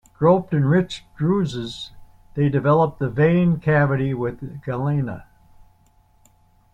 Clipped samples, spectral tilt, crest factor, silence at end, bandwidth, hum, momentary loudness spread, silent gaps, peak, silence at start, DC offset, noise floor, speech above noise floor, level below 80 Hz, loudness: under 0.1%; -8 dB/octave; 18 dB; 1.5 s; 8.8 kHz; none; 14 LU; none; -4 dBFS; 0.2 s; under 0.1%; -57 dBFS; 37 dB; -50 dBFS; -21 LUFS